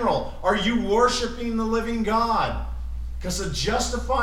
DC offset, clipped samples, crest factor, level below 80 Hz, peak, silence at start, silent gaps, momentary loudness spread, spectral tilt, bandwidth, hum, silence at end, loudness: under 0.1%; under 0.1%; 18 dB; -34 dBFS; -6 dBFS; 0 s; none; 12 LU; -4.5 dB/octave; 15.5 kHz; none; 0 s; -24 LUFS